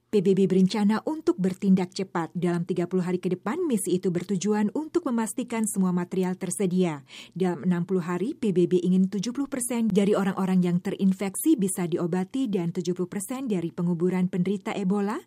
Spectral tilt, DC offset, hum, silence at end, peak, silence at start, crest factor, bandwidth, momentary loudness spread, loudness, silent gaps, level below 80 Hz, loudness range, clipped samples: -6.5 dB/octave; under 0.1%; none; 0.05 s; -10 dBFS; 0.15 s; 16 dB; 15.5 kHz; 6 LU; -26 LUFS; none; -70 dBFS; 3 LU; under 0.1%